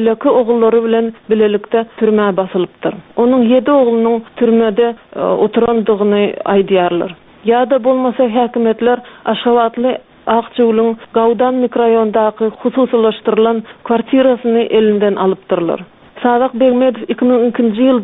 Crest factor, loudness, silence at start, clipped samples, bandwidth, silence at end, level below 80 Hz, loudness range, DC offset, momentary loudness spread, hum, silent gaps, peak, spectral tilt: 12 dB; -13 LUFS; 0 s; under 0.1%; 4 kHz; 0 s; -52 dBFS; 1 LU; under 0.1%; 6 LU; none; none; 0 dBFS; -5 dB/octave